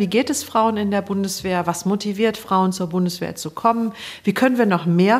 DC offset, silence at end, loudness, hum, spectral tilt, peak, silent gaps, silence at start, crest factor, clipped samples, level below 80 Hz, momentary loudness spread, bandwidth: under 0.1%; 0 s; -20 LUFS; none; -5.5 dB/octave; -2 dBFS; none; 0 s; 16 dB; under 0.1%; -58 dBFS; 6 LU; 15.5 kHz